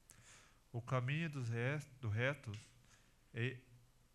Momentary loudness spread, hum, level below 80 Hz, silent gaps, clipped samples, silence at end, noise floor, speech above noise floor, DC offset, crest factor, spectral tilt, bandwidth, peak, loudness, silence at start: 21 LU; none; -72 dBFS; none; under 0.1%; 0.35 s; -69 dBFS; 27 dB; under 0.1%; 20 dB; -6.5 dB/octave; 12.5 kHz; -24 dBFS; -42 LUFS; 0.2 s